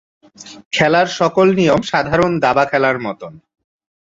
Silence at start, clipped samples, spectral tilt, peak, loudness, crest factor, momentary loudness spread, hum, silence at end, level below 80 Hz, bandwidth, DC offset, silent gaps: 0.4 s; under 0.1%; -5.5 dB/octave; -2 dBFS; -15 LUFS; 16 dB; 10 LU; none; 0.65 s; -48 dBFS; 7.8 kHz; under 0.1%; 0.65-0.71 s